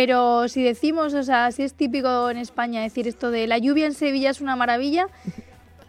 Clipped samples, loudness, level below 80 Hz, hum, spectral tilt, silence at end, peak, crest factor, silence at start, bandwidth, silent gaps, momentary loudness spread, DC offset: under 0.1%; -22 LUFS; -58 dBFS; none; -4.5 dB/octave; 0.5 s; -6 dBFS; 16 dB; 0 s; 13 kHz; none; 7 LU; under 0.1%